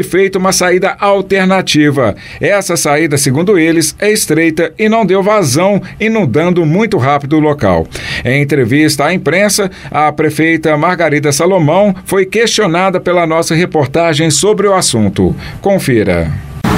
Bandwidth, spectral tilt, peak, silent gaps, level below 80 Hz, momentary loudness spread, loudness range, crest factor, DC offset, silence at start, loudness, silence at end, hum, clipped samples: 16.5 kHz; -4.5 dB/octave; 0 dBFS; none; -36 dBFS; 4 LU; 1 LU; 10 dB; under 0.1%; 0 s; -10 LUFS; 0 s; none; under 0.1%